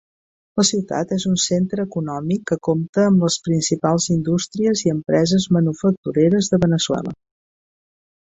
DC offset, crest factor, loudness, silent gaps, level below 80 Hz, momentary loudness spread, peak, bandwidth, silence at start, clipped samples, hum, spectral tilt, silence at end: under 0.1%; 16 dB; -19 LUFS; 2.89-2.93 s, 5.97-6.03 s; -52 dBFS; 6 LU; -4 dBFS; 8.4 kHz; 0.55 s; under 0.1%; none; -5 dB/octave; 1.25 s